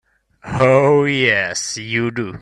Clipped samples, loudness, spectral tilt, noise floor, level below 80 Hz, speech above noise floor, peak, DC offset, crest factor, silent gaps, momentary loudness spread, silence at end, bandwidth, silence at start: under 0.1%; -16 LUFS; -4.5 dB/octave; -36 dBFS; -48 dBFS; 20 dB; 0 dBFS; under 0.1%; 16 dB; none; 10 LU; 0 s; 12 kHz; 0.45 s